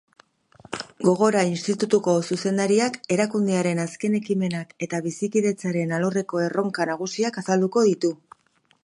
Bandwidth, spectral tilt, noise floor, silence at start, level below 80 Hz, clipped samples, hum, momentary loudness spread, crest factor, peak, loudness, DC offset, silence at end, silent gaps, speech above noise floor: 11 kHz; -5.5 dB/octave; -64 dBFS; 0.7 s; -68 dBFS; under 0.1%; none; 8 LU; 18 dB; -6 dBFS; -23 LUFS; under 0.1%; 0.7 s; none; 42 dB